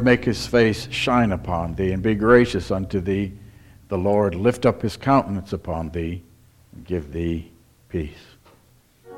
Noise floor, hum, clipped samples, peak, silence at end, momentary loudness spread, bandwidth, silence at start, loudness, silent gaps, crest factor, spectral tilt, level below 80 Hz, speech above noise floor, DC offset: -56 dBFS; none; under 0.1%; -2 dBFS; 0 s; 13 LU; 15 kHz; 0 s; -22 LUFS; none; 20 dB; -6.5 dB/octave; -42 dBFS; 35 dB; under 0.1%